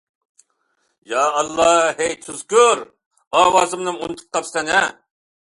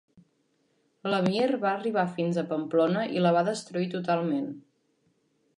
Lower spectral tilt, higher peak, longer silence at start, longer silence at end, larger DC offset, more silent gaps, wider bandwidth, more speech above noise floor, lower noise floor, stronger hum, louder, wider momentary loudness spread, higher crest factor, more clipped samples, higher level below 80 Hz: second, -1.5 dB/octave vs -6.5 dB/octave; first, -2 dBFS vs -12 dBFS; about the same, 1.1 s vs 1.05 s; second, 0.5 s vs 1 s; neither; first, 3.06-3.11 s, 3.27-3.31 s vs none; about the same, 11.5 kHz vs 11 kHz; first, 50 dB vs 44 dB; about the same, -68 dBFS vs -71 dBFS; neither; first, -18 LUFS vs -27 LUFS; first, 11 LU vs 7 LU; about the same, 18 dB vs 18 dB; neither; first, -58 dBFS vs -78 dBFS